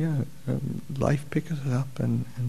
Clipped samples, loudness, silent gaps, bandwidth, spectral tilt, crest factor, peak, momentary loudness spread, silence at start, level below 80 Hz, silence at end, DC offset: under 0.1%; -29 LUFS; none; 13.5 kHz; -8 dB/octave; 20 dB; -8 dBFS; 4 LU; 0 s; -52 dBFS; 0 s; 1%